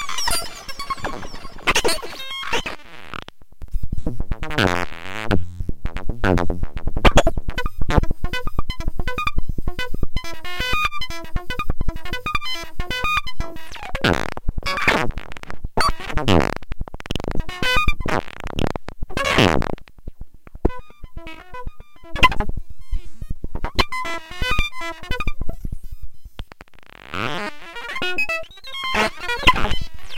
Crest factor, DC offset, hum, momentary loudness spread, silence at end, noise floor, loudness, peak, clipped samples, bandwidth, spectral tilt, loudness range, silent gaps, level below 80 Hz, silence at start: 20 dB; under 0.1%; none; 18 LU; 0 s; -43 dBFS; -23 LUFS; 0 dBFS; under 0.1%; 16 kHz; -4 dB/octave; 5 LU; none; -28 dBFS; 0 s